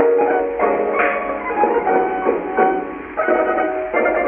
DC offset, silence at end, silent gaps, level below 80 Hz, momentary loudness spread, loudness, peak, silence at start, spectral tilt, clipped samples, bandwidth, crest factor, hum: under 0.1%; 0 s; none; -50 dBFS; 5 LU; -18 LUFS; -2 dBFS; 0 s; -9.5 dB/octave; under 0.1%; 3.5 kHz; 16 dB; none